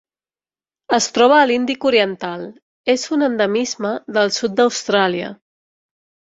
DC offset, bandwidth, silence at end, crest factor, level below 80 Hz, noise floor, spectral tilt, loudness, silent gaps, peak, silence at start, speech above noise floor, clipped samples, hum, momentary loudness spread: under 0.1%; 8 kHz; 1.05 s; 18 dB; -64 dBFS; under -90 dBFS; -3 dB/octave; -17 LUFS; 2.62-2.84 s; -2 dBFS; 0.9 s; over 73 dB; under 0.1%; none; 13 LU